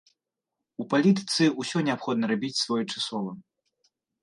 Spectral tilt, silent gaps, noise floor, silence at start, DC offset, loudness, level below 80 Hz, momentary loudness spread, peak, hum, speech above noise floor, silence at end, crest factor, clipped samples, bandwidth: -4.5 dB/octave; none; -86 dBFS; 0.8 s; under 0.1%; -26 LUFS; -76 dBFS; 15 LU; -10 dBFS; none; 60 dB; 0.8 s; 18 dB; under 0.1%; 11.5 kHz